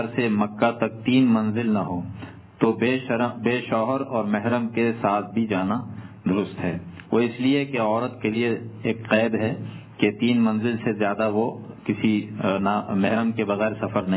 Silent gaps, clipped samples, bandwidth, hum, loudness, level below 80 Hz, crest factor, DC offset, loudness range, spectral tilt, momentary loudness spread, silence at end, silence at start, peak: none; under 0.1%; 4 kHz; none; -24 LUFS; -56 dBFS; 18 dB; under 0.1%; 2 LU; -11 dB/octave; 8 LU; 0 s; 0 s; -4 dBFS